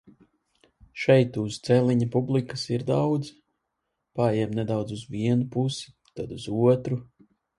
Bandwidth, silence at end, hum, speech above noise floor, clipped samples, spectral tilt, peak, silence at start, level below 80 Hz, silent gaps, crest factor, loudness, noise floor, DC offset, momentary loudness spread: 11.5 kHz; 0.55 s; none; 56 dB; under 0.1%; -7 dB/octave; -6 dBFS; 0.95 s; -58 dBFS; none; 20 dB; -25 LUFS; -80 dBFS; under 0.1%; 15 LU